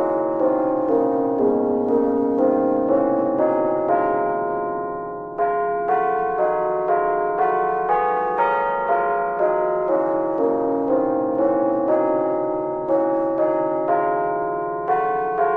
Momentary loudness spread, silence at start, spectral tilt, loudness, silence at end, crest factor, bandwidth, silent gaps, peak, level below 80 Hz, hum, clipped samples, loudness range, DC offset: 4 LU; 0 s; -9.5 dB/octave; -21 LUFS; 0 s; 14 dB; 4 kHz; none; -6 dBFS; -54 dBFS; none; under 0.1%; 2 LU; under 0.1%